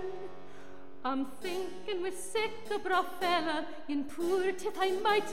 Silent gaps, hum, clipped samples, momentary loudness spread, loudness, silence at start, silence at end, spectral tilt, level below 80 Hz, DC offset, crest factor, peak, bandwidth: none; none; under 0.1%; 15 LU; -33 LUFS; 0 s; 0 s; -3 dB/octave; -66 dBFS; 1%; 18 dB; -16 dBFS; 16 kHz